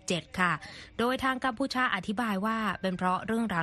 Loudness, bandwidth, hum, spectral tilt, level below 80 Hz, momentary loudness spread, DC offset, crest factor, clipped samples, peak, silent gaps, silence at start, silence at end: -30 LUFS; 13 kHz; none; -4.5 dB/octave; -58 dBFS; 4 LU; under 0.1%; 18 dB; under 0.1%; -12 dBFS; none; 0.05 s; 0 s